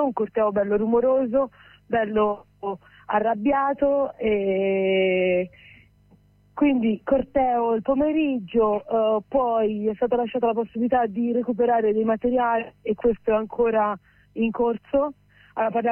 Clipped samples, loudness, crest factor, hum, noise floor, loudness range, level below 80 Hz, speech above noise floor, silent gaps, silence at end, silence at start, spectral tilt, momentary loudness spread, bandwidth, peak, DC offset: under 0.1%; -23 LUFS; 14 dB; none; -57 dBFS; 1 LU; -52 dBFS; 34 dB; none; 0 s; 0 s; -9.5 dB/octave; 7 LU; 3.3 kHz; -10 dBFS; under 0.1%